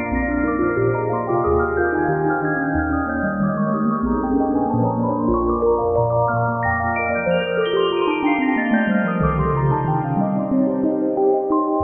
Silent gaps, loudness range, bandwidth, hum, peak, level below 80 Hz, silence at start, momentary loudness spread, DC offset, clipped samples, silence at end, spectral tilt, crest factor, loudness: none; 1 LU; 3.5 kHz; none; -6 dBFS; -36 dBFS; 0 s; 2 LU; under 0.1%; under 0.1%; 0 s; -10.5 dB/octave; 12 dB; -19 LUFS